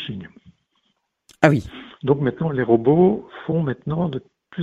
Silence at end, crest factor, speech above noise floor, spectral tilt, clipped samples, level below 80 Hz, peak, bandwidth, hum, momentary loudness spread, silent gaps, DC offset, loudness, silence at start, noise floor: 0 s; 22 dB; 51 dB; -8 dB/octave; under 0.1%; -52 dBFS; 0 dBFS; 8.2 kHz; none; 17 LU; none; under 0.1%; -20 LUFS; 0 s; -71 dBFS